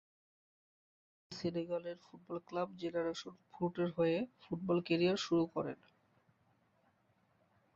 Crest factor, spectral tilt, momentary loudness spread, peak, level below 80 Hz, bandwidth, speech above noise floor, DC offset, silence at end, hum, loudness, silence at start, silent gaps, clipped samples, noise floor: 20 dB; -5.5 dB/octave; 14 LU; -20 dBFS; -76 dBFS; 7.4 kHz; 38 dB; under 0.1%; 2 s; none; -38 LUFS; 1.3 s; none; under 0.1%; -75 dBFS